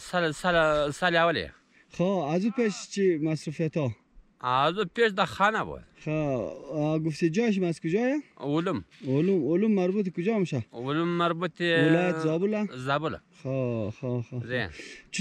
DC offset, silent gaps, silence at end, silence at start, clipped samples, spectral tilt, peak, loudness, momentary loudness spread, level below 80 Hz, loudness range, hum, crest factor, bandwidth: under 0.1%; none; 0 s; 0 s; under 0.1%; -6 dB/octave; -10 dBFS; -27 LUFS; 10 LU; -58 dBFS; 2 LU; none; 18 dB; 11.5 kHz